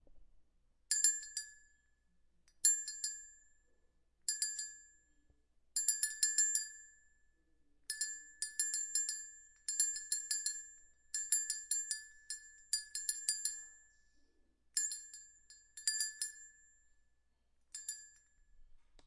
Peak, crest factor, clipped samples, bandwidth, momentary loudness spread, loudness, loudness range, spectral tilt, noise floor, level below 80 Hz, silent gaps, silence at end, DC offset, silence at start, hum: -14 dBFS; 28 dB; under 0.1%; 11.5 kHz; 19 LU; -36 LUFS; 5 LU; 5.5 dB/octave; -75 dBFS; -74 dBFS; none; 0.05 s; under 0.1%; 0.1 s; none